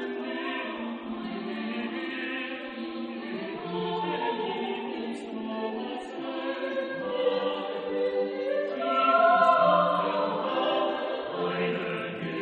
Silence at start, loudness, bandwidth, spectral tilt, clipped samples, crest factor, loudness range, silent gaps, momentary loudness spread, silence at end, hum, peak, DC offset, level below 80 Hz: 0 s; -29 LUFS; 9.4 kHz; -6.5 dB/octave; under 0.1%; 20 dB; 9 LU; none; 14 LU; 0 s; none; -10 dBFS; under 0.1%; -72 dBFS